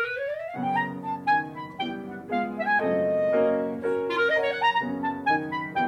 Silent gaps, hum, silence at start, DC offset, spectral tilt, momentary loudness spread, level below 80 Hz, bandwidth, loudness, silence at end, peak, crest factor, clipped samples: none; none; 0 s; under 0.1%; -6.5 dB/octave; 9 LU; -68 dBFS; 11.5 kHz; -26 LUFS; 0 s; -12 dBFS; 14 dB; under 0.1%